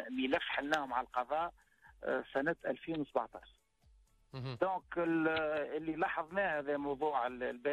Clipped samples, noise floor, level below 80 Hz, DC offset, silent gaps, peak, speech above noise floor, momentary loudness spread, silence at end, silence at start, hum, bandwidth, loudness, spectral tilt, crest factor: under 0.1%; -68 dBFS; -68 dBFS; under 0.1%; none; -20 dBFS; 32 dB; 8 LU; 0 s; 0 s; none; 12.5 kHz; -37 LUFS; -6 dB/octave; 16 dB